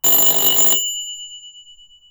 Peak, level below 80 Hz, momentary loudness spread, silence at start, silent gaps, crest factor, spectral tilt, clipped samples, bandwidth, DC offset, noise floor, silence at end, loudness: -2 dBFS; -56 dBFS; 20 LU; 0.05 s; none; 16 dB; 0.5 dB/octave; under 0.1%; over 20 kHz; under 0.1%; -46 dBFS; 0.5 s; -12 LUFS